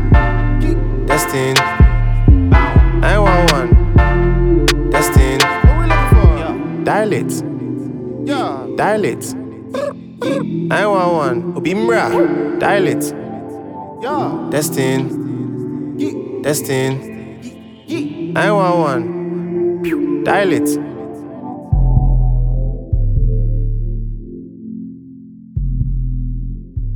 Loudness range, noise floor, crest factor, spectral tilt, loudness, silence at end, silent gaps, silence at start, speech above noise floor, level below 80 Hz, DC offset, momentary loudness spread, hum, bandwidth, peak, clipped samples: 8 LU; -36 dBFS; 14 dB; -6 dB/octave; -16 LUFS; 0 s; none; 0 s; 20 dB; -18 dBFS; under 0.1%; 16 LU; none; 18.5 kHz; 0 dBFS; under 0.1%